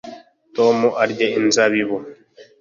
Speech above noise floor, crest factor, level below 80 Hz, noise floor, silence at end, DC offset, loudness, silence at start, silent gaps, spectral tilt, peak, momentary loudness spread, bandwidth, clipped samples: 23 dB; 18 dB; -64 dBFS; -40 dBFS; 0.15 s; under 0.1%; -18 LUFS; 0.05 s; none; -3.5 dB/octave; -2 dBFS; 13 LU; 7.8 kHz; under 0.1%